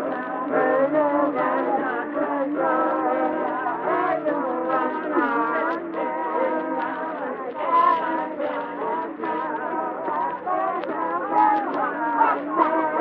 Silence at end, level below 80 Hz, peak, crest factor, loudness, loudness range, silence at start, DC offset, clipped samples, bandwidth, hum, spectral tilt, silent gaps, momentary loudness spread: 0 s; -68 dBFS; -4 dBFS; 18 dB; -23 LUFS; 2 LU; 0 s; under 0.1%; under 0.1%; 5.4 kHz; none; -8.5 dB/octave; none; 7 LU